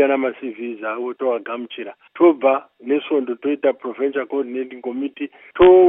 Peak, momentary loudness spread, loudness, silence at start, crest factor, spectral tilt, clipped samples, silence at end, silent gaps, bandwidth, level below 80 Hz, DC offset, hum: 0 dBFS; 14 LU; -21 LUFS; 0 s; 18 dB; -9.5 dB/octave; under 0.1%; 0 s; none; 3.7 kHz; -50 dBFS; under 0.1%; none